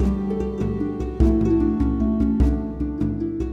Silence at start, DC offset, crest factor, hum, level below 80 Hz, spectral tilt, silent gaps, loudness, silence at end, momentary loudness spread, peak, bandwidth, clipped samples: 0 s; under 0.1%; 16 dB; none; -26 dBFS; -10 dB/octave; none; -22 LUFS; 0 s; 7 LU; -6 dBFS; 6.6 kHz; under 0.1%